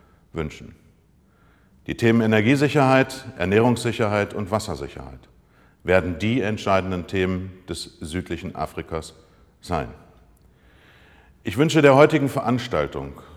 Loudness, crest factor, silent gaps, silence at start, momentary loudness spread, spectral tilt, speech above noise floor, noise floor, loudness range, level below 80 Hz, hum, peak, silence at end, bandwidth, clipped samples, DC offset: -21 LUFS; 22 dB; none; 0.35 s; 17 LU; -6 dB/octave; 36 dB; -58 dBFS; 12 LU; -48 dBFS; none; -2 dBFS; 0 s; 15.5 kHz; under 0.1%; under 0.1%